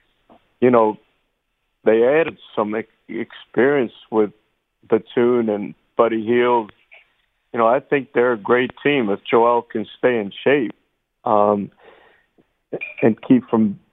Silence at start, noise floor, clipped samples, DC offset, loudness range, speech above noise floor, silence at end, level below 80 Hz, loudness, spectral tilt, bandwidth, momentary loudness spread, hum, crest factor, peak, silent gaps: 0.6 s; -72 dBFS; under 0.1%; under 0.1%; 3 LU; 54 dB; 0.15 s; -66 dBFS; -19 LUFS; -9.5 dB/octave; 4 kHz; 13 LU; none; 20 dB; 0 dBFS; none